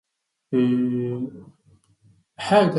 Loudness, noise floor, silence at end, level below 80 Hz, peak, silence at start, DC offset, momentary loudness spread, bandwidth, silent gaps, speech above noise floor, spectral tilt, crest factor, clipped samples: -23 LUFS; -59 dBFS; 0 s; -66 dBFS; -6 dBFS; 0.5 s; under 0.1%; 13 LU; 11 kHz; none; 38 dB; -7 dB/octave; 18 dB; under 0.1%